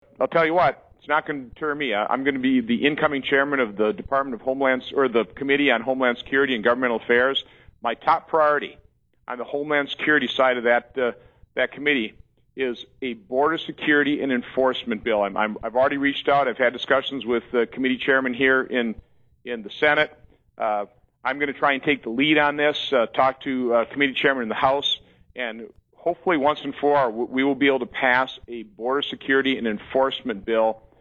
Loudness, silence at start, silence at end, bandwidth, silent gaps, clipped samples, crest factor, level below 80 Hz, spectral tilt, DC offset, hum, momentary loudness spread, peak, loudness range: -22 LUFS; 0.2 s; 0.2 s; 7 kHz; none; under 0.1%; 18 dB; -58 dBFS; -6 dB/octave; under 0.1%; none; 10 LU; -4 dBFS; 3 LU